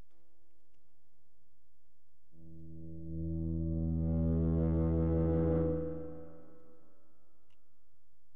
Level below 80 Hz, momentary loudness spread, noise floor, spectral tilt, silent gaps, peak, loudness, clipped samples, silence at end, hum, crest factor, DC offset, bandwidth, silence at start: -46 dBFS; 20 LU; -77 dBFS; -13 dB/octave; none; -20 dBFS; -34 LUFS; under 0.1%; 1.95 s; none; 16 dB; 0.7%; 2.3 kHz; 2.4 s